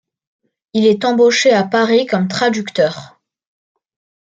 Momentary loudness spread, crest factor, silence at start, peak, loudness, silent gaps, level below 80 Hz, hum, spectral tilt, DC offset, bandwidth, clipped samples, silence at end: 7 LU; 14 dB; 0.75 s; -2 dBFS; -14 LUFS; none; -64 dBFS; none; -4.5 dB/octave; under 0.1%; 9.2 kHz; under 0.1%; 1.25 s